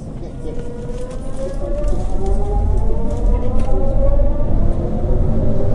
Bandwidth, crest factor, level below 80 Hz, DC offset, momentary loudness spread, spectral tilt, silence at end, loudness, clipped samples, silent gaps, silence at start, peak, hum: 3.6 kHz; 12 dB; -18 dBFS; under 0.1%; 10 LU; -9 dB/octave; 0 s; -22 LUFS; under 0.1%; none; 0 s; -2 dBFS; none